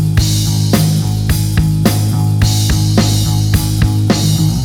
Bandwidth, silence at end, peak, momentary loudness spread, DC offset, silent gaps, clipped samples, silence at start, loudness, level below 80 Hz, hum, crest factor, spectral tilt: 18.5 kHz; 0 s; 0 dBFS; 2 LU; under 0.1%; none; under 0.1%; 0 s; -13 LUFS; -24 dBFS; none; 12 dB; -5.5 dB/octave